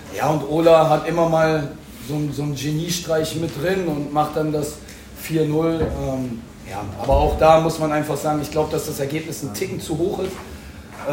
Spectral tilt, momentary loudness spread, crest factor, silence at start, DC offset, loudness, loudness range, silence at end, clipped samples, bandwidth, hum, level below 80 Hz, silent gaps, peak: -5.5 dB/octave; 17 LU; 20 dB; 0 s; under 0.1%; -20 LUFS; 4 LU; 0 s; under 0.1%; 16.5 kHz; none; -36 dBFS; none; -2 dBFS